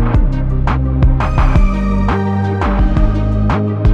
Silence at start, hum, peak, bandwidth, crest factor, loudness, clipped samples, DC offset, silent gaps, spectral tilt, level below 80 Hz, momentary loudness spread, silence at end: 0 s; none; 0 dBFS; 6.6 kHz; 12 dB; -15 LUFS; under 0.1%; under 0.1%; none; -9 dB/octave; -14 dBFS; 2 LU; 0 s